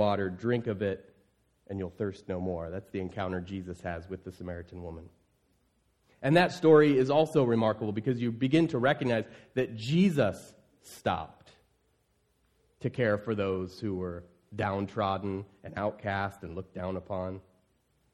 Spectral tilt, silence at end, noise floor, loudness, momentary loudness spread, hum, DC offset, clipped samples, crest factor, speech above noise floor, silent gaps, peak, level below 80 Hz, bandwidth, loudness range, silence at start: -7 dB/octave; 0.75 s; -72 dBFS; -30 LUFS; 17 LU; none; under 0.1%; under 0.1%; 22 dB; 43 dB; none; -10 dBFS; -62 dBFS; 13 kHz; 11 LU; 0 s